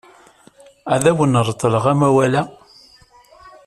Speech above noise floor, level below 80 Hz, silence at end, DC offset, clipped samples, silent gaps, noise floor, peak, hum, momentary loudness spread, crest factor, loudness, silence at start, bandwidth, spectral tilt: 34 dB; -52 dBFS; 0.2 s; under 0.1%; under 0.1%; none; -49 dBFS; -2 dBFS; none; 8 LU; 16 dB; -16 LUFS; 0.85 s; 13 kHz; -6 dB/octave